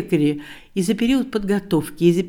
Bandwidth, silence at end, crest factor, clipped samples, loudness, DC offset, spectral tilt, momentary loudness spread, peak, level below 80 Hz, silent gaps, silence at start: 18 kHz; 0 s; 16 dB; under 0.1%; -21 LUFS; under 0.1%; -6.5 dB/octave; 7 LU; -4 dBFS; -46 dBFS; none; 0 s